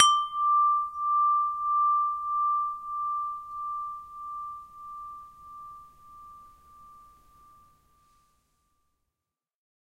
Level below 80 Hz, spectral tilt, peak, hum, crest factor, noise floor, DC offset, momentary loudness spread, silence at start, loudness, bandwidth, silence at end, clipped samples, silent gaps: -66 dBFS; 2 dB/octave; -2 dBFS; none; 28 dB; -89 dBFS; under 0.1%; 23 LU; 0 s; -27 LUFS; 11 kHz; 3 s; under 0.1%; none